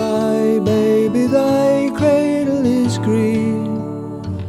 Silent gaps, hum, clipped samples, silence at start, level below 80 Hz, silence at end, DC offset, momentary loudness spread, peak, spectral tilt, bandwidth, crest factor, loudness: none; none; under 0.1%; 0 s; -50 dBFS; 0 s; under 0.1%; 8 LU; -4 dBFS; -7 dB/octave; 14 kHz; 12 dB; -16 LUFS